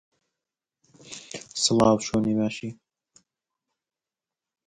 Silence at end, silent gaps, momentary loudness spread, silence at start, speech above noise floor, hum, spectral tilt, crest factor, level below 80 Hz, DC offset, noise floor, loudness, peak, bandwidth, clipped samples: 1.95 s; none; 19 LU; 1.05 s; over 67 dB; none; -4.5 dB/octave; 22 dB; -58 dBFS; under 0.1%; under -90 dBFS; -24 LUFS; -6 dBFS; 11 kHz; under 0.1%